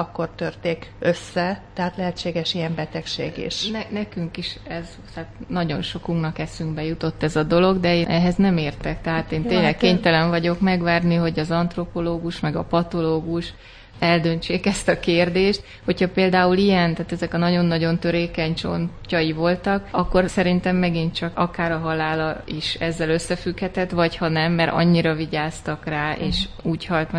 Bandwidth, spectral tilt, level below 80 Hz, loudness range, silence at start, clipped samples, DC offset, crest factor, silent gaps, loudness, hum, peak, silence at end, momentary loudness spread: 10.5 kHz; -6 dB/octave; -40 dBFS; 7 LU; 0 s; under 0.1%; under 0.1%; 20 dB; none; -22 LUFS; none; -2 dBFS; 0 s; 10 LU